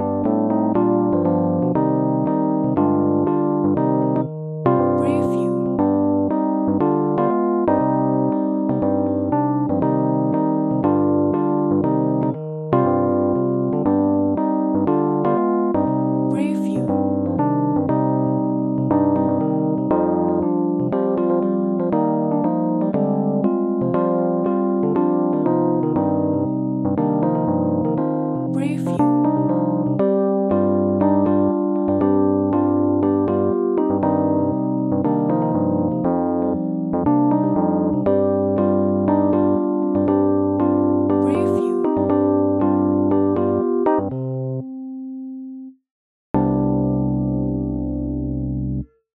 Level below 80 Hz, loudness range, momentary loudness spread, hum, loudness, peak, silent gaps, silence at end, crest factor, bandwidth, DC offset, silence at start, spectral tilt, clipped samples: -46 dBFS; 2 LU; 4 LU; none; -19 LUFS; -2 dBFS; 45.91-46.34 s; 0.3 s; 16 dB; 3.9 kHz; under 0.1%; 0 s; -11 dB/octave; under 0.1%